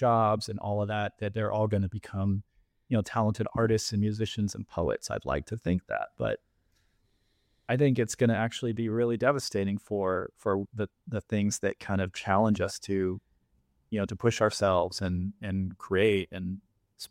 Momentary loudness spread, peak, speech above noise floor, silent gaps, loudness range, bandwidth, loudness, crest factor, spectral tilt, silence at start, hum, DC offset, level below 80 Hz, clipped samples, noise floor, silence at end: 8 LU; -10 dBFS; 43 dB; none; 3 LU; 15.5 kHz; -30 LUFS; 20 dB; -6 dB/octave; 0 s; none; under 0.1%; -56 dBFS; under 0.1%; -71 dBFS; 0.05 s